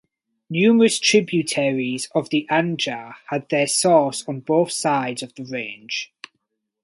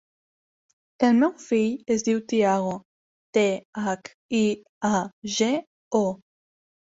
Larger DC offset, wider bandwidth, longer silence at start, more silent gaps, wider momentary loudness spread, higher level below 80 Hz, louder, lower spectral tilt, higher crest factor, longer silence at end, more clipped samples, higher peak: neither; first, 11.5 kHz vs 8 kHz; second, 0.5 s vs 1 s; second, none vs 2.85-3.33 s, 3.65-3.73 s, 4.14-4.29 s, 4.69-4.81 s, 5.13-5.22 s, 5.67-5.91 s; first, 13 LU vs 8 LU; about the same, -70 dBFS vs -66 dBFS; first, -20 LUFS vs -25 LUFS; about the same, -4 dB/octave vs -5 dB/octave; about the same, 18 dB vs 20 dB; about the same, 0.8 s vs 0.75 s; neither; about the same, -4 dBFS vs -6 dBFS